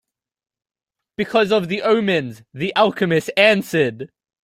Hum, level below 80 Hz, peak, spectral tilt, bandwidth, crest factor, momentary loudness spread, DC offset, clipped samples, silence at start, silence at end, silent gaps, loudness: none; -60 dBFS; -2 dBFS; -5.5 dB/octave; 16 kHz; 18 dB; 17 LU; under 0.1%; under 0.1%; 1.2 s; 0.4 s; none; -18 LUFS